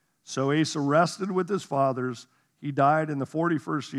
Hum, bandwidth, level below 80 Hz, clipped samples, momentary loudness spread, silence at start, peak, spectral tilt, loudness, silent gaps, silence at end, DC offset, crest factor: none; 12.5 kHz; -82 dBFS; under 0.1%; 11 LU; 0.3 s; -8 dBFS; -6 dB/octave; -26 LUFS; none; 0 s; under 0.1%; 18 dB